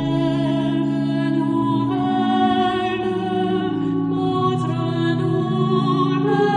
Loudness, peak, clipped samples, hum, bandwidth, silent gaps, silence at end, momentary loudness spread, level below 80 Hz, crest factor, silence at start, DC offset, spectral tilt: -20 LUFS; -6 dBFS; under 0.1%; none; 9.8 kHz; none; 0 s; 4 LU; -52 dBFS; 12 dB; 0 s; under 0.1%; -8 dB/octave